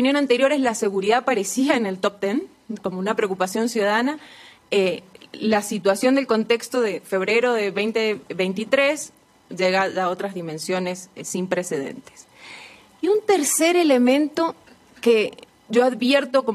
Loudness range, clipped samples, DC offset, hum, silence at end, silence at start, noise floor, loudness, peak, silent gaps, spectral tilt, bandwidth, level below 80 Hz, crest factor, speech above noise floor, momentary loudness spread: 5 LU; under 0.1%; under 0.1%; none; 0 s; 0 s; -44 dBFS; -21 LUFS; -4 dBFS; none; -3.5 dB/octave; 15.5 kHz; -70 dBFS; 16 dB; 23 dB; 11 LU